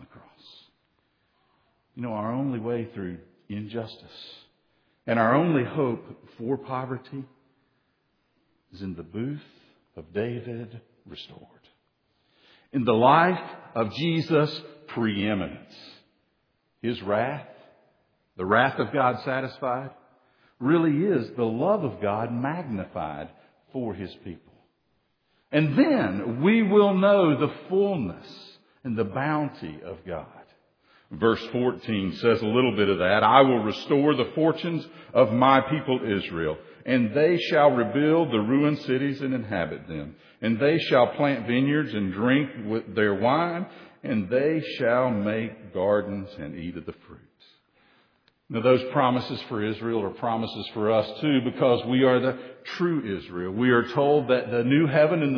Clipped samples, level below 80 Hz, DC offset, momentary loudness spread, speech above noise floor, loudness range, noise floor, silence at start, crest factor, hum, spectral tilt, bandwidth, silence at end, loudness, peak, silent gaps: under 0.1%; -62 dBFS; under 0.1%; 17 LU; 48 dB; 12 LU; -72 dBFS; 0.15 s; 24 dB; none; -8.5 dB/octave; 5.4 kHz; 0 s; -24 LUFS; -2 dBFS; none